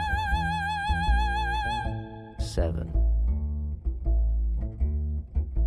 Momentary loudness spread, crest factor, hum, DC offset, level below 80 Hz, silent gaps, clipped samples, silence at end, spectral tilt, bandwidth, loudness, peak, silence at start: 7 LU; 12 dB; none; under 0.1%; -28 dBFS; none; under 0.1%; 0 s; -6 dB/octave; 11 kHz; -29 LUFS; -14 dBFS; 0 s